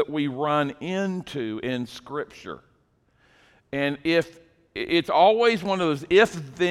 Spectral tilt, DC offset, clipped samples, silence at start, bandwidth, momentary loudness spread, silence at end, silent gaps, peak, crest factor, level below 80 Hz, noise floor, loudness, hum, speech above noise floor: -5.5 dB/octave; under 0.1%; under 0.1%; 0 s; 13.5 kHz; 17 LU; 0 s; none; -6 dBFS; 20 dB; -60 dBFS; -65 dBFS; -24 LUFS; none; 41 dB